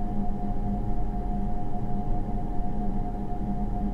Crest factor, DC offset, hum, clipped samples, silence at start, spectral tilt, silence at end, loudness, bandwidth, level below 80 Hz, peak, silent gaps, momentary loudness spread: 12 dB; under 0.1%; none; under 0.1%; 0 s; -10 dB/octave; 0 s; -32 LUFS; 3.1 kHz; -30 dBFS; -14 dBFS; none; 2 LU